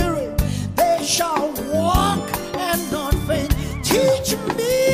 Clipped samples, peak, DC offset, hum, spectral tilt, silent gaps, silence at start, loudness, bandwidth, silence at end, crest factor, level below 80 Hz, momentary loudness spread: under 0.1%; -4 dBFS; under 0.1%; none; -4.5 dB/octave; none; 0 s; -20 LUFS; 15.5 kHz; 0 s; 16 dB; -30 dBFS; 6 LU